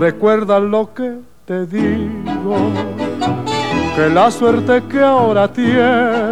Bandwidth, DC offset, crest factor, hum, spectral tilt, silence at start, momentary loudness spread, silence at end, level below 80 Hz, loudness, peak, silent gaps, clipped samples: 12.5 kHz; 1%; 14 dB; none; -6.5 dB/octave; 0 s; 10 LU; 0 s; -44 dBFS; -15 LUFS; -2 dBFS; none; under 0.1%